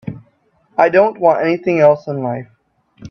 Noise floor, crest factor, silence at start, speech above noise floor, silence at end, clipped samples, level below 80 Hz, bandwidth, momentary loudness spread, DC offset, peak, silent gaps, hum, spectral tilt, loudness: -57 dBFS; 16 dB; 0.05 s; 44 dB; 0 s; under 0.1%; -58 dBFS; 6.4 kHz; 12 LU; under 0.1%; 0 dBFS; none; none; -8 dB/octave; -14 LUFS